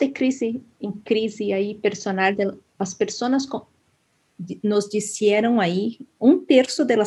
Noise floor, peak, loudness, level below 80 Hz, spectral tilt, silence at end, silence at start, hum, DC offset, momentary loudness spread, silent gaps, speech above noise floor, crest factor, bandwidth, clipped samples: -66 dBFS; -4 dBFS; -22 LUFS; -70 dBFS; -5 dB/octave; 0 s; 0 s; none; under 0.1%; 13 LU; none; 44 dB; 18 dB; 12 kHz; under 0.1%